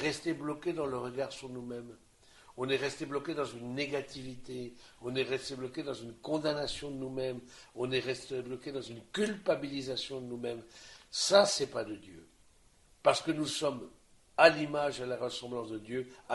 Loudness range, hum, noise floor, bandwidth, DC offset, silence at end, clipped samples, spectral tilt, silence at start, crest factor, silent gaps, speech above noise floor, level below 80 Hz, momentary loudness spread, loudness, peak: 7 LU; none; -64 dBFS; 11.5 kHz; under 0.1%; 0 s; under 0.1%; -3.5 dB/octave; 0 s; 28 dB; none; 30 dB; -64 dBFS; 17 LU; -34 LUFS; -8 dBFS